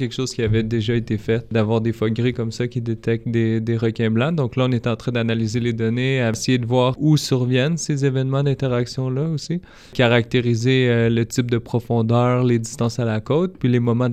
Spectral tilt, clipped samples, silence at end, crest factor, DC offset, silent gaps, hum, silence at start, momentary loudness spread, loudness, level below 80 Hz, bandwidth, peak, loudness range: -6.5 dB/octave; under 0.1%; 0 s; 16 dB; under 0.1%; none; none; 0 s; 6 LU; -20 LUFS; -46 dBFS; 13 kHz; -4 dBFS; 2 LU